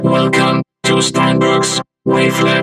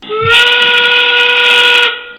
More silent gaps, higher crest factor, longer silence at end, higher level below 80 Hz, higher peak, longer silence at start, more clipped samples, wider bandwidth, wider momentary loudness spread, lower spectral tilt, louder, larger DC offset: neither; about the same, 12 dB vs 8 dB; about the same, 0 s vs 0 s; about the same, -50 dBFS vs -46 dBFS; about the same, 0 dBFS vs 0 dBFS; about the same, 0 s vs 0 s; second, under 0.1% vs 0.6%; second, 15.5 kHz vs over 20 kHz; first, 5 LU vs 2 LU; first, -4.5 dB/octave vs -1 dB/octave; second, -13 LUFS vs -6 LUFS; neither